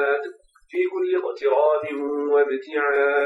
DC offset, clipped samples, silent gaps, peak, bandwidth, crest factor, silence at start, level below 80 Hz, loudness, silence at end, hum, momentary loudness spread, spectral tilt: under 0.1%; under 0.1%; none; -8 dBFS; 5.4 kHz; 14 dB; 0 s; -70 dBFS; -22 LUFS; 0 s; none; 7 LU; -5.5 dB/octave